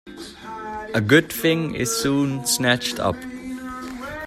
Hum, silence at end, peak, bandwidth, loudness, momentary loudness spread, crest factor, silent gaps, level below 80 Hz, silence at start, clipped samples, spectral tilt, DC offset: none; 0 s; -2 dBFS; 16 kHz; -21 LUFS; 16 LU; 20 dB; none; -50 dBFS; 0.05 s; under 0.1%; -4 dB/octave; under 0.1%